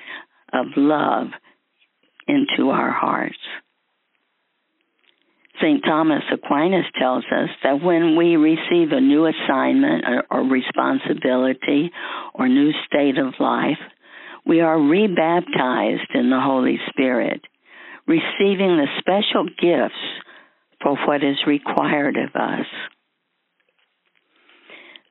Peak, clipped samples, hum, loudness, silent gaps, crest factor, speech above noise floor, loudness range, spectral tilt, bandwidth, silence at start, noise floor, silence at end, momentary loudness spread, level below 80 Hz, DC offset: 0 dBFS; under 0.1%; none; -19 LUFS; none; 20 dB; 54 dB; 6 LU; -3.5 dB/octave; 4.1 kHz; 0 s; -73 dBFS; 0.35 s; 13 LU; -70 dBFS; under 0.1%